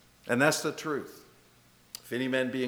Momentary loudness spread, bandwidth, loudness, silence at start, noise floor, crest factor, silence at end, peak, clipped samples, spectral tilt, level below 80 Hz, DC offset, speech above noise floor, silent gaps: 20 LU; over 20 kHz; -30 LUFS; 0.25 s; -61 dBFS; 22 dB; 0 s; -8 dBFS; under 0.1%; -4 dB/octave; -72 dBFS; under 0.1%; 32 dB; none